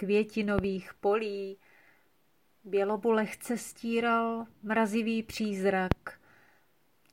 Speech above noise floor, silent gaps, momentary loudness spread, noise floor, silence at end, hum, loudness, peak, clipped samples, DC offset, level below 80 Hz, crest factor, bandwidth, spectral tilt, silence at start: 41 dB; none; 8 LU; -72 dBFS; 0.95 s; none; -31 LUFS; -6 dBFS; under 0.1%; under 0.1%; -54 dBFS; 24 dB; 16.5 kHz; -6 dB/octave; 0 s